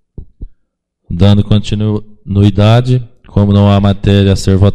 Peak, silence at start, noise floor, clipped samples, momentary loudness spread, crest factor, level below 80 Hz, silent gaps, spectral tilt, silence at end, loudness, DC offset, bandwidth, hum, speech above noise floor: 0 dBFS; 0.2 s; -63 dBFS; 0.4%; 9 LU; 10 dB; -26 dBFS; none; -7.5 dB/octave; 0 s; -11 LUFS; under 0.1%; 9.6 kHz; none; 54 dB